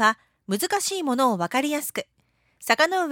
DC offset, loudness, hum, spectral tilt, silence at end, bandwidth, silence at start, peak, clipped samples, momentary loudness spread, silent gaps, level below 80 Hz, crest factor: under 0.1%; -24 LUFS; none; -3 dB/octave; 0 s; 19.5 kHz; 0 s; -4 dBFS; under 0.1%; 12 LU; none; -72 dBFS; 20 dB